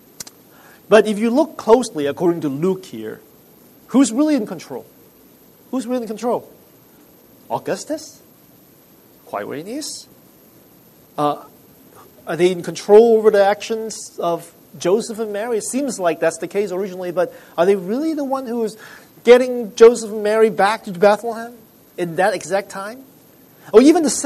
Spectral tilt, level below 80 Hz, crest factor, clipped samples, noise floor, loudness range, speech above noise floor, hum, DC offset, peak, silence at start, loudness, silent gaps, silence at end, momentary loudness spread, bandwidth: -4.5 dB/octave; -62 dBFS; 18 dB; under 0.1%; -49 dBFS; 13 LU; 32 dB; none; under 0.1%; 0 dBFS; 0.9 s; -18 LUFS; none; 0 s; 18 LU; 13.5 kHz